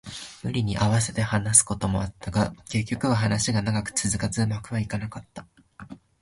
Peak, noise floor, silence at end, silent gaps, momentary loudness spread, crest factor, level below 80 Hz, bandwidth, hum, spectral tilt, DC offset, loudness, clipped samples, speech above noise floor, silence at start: -2 dBFS; -45 dBFS; 0.25 s; none; 19 LU; 24 dB; -46 dBFS; 11.5 kHz; none; -4 dB/octave; under 0.1%; -25 LUFS; under 0.1%; 20 dB; 0.05 s